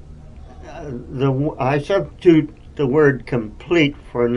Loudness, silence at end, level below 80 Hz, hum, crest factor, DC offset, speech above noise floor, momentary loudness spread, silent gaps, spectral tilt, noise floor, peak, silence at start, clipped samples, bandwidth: -18 LUFS; 0 s; -42 dBFS; none; 18 dB; under 0.1%; 20 dB; 17 LU; none; -7.5 dB/octave; -38 dBFS; -2 dBFS; 0.05 s; under 0.1%; 10 kHz